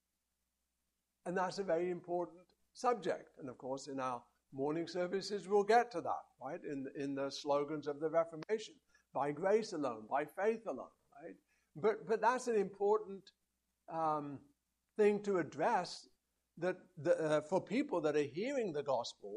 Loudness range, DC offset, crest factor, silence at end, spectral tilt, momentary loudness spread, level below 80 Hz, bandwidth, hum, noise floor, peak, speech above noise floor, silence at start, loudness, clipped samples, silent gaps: 4 LU; under 0.1%; 20 dB; 0 s; -5.5 dB/octave; 14 LU; -82 dBFS; 11.5 kHz; none; -87 dBFS; -18 dBFS; 50 dB; 1.25 s; -38 LUFS; under 0.1%; none